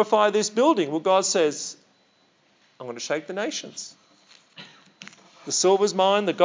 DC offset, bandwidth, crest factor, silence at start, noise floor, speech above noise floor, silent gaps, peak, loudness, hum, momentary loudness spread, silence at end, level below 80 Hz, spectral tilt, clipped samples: under 0.1%; 7.8 kHz; 18 dB; 0 s; -63 dBFS; 41 dB; none; -6 dBFS; -22 LUFS; none; 25 LU; 0 s; under -90 dBFS; -3 dB/octave; under 0.1%